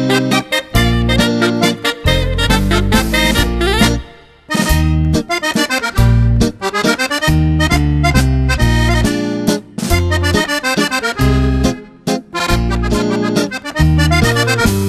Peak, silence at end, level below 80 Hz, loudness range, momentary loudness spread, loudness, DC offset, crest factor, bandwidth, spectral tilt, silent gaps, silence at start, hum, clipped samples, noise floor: 0 dBFS; 0 s; -20 dBFS; 2 LU; 5 LU; -14 LUFS; under 0.1%; 14 dB; 14 kHz; -5 dB/octave; none; 0 s; none; under 0.1%; -36 dBFS